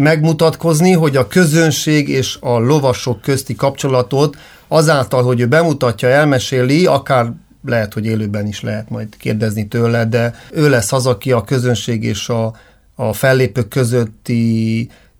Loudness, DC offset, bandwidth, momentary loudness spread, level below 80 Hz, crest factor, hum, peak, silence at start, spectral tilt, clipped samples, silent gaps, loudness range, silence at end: -15 LUFS; under 0.1%; 17.5 kHz; 8 LU; -48 dBFS; 14 dB; none; 0 dBFS; 0 s; -5.5 dB/octave; under 0.1%; none; 4 LU; 0.3 s